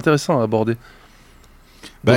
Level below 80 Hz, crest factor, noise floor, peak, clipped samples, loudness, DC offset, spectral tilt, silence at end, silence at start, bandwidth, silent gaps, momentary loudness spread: -48 dBFS; 18 dB; -47 dBFS; -2 dBFS; under 0.1%; -20 LUFS; under 0.1%; -6 dB/octave; 0 s; 0 s; 16.5 kHz; none; 25 LU